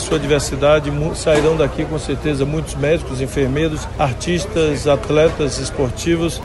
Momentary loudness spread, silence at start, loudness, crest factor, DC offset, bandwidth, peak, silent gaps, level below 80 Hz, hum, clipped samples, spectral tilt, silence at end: 6 LU; 0 s; -18 LUFS; 16 dB; under 0.1%; 12 kHz; -2 dBFS; none; -30 dBFS; none; under 0.1%; -5.5 dB/octave; 0 s